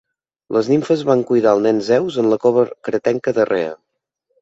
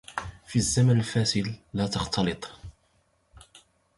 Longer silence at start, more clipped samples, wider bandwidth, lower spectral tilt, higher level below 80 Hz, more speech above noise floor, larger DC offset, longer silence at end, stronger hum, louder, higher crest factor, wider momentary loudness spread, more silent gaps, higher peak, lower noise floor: first, 0.5 s vs 0.1 s; neither; second, 8 kHz vs 11.5 kHz; first, -6.5 dB/octave vs -5 dB/octave; second, -60 dBFS vs -50 dBFS; first, 56 dB vs 42 dB; neither; first, 0.65 s vs 0.4 s; neither; first, -17 LUFS vs -26 LUFS; about the same, 16 dB vs 18 dB; second, 6 LU vs 15 LU; neither; first, -2 dBFS vs -12 dBFS; first, -72 dBFS vs -68 dBFS